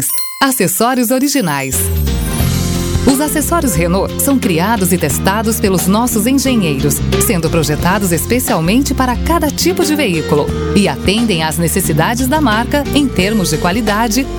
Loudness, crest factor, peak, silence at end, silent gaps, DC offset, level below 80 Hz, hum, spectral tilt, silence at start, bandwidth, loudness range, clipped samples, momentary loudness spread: -13 LUFS; 12 dB; 0 dBFS; 0 s; none; under 0.1%; -26 dBFS; none; -4.5 dB/octave; 0 s; over 20 kHz; 1 LU; under 0.1%; 2 LU